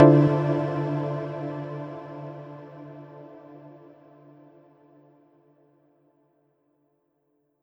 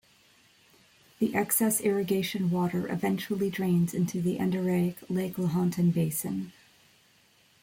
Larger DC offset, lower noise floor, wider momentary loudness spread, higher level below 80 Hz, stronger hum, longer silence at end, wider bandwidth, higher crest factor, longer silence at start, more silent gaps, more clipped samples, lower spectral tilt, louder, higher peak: neither; first, -72 dBFS vs -63 dBFS; first, 25 LU vs 7 LU; about the same, -66 dBFS vs -66 dBFS; neither; first, 3.9 s vs 1.1 s; second, 5.8 kHz vs 17 kHz; first, 26 dB vs 16 dB; second, 0 s vs 1.2 s; neither; neither; first, -10.5 dB/octave vs -6 dB/octave; about the same, -26 LUFS vs -28 LUFS; first, 0 dBFS vs -12 dBFS